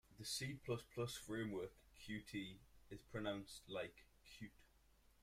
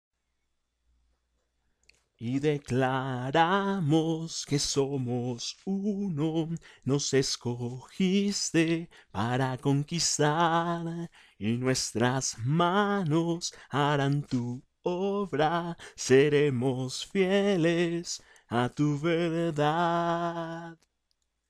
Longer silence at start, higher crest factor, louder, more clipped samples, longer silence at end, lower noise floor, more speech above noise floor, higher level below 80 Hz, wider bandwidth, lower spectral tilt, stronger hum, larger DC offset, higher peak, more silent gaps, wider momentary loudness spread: second, 0.1 s vs 2.2 s; about the same, 20 dB vs 18 dB; second, -49 LUFS vs -28 LUFS; neither; second, 0.55 s vs 0.75 s; second, -73 dBFS vs -78 dBFS; second, 24 dB vs 50 dB; second, -70 dBFS vs -62 dBFS; first, 16 kHz vs 14 kHz; about the same, -4.5 dB/octave vs -5 dB/octave; neither; neither; second, -30 dBFS vs -12 dBFS; neither; first, 14 LU vs 11 LU